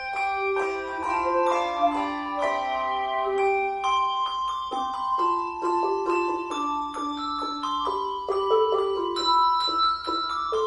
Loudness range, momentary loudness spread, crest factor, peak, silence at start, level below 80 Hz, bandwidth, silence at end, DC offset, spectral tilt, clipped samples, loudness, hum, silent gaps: 3 LU; 7 LU; 14 dB; -12 dBFS; 0 s; -56 dBFS; 10.5 kHz; 0 s; under 0.1%; -3 dB/octave; under 0.1%; -25 LUFS; none; none